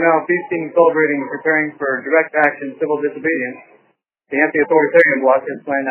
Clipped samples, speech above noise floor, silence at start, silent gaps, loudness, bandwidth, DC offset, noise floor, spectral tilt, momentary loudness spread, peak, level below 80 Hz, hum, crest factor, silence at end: under 0.1%; 45 dB; 0 s; none; -16 LUFS; 4 kHz; under 0.1%; -61 dBFS; -9.5 dB/octave; 9 LU; 0 dBFS; -72 dBFS; none; 16 dB; 0 s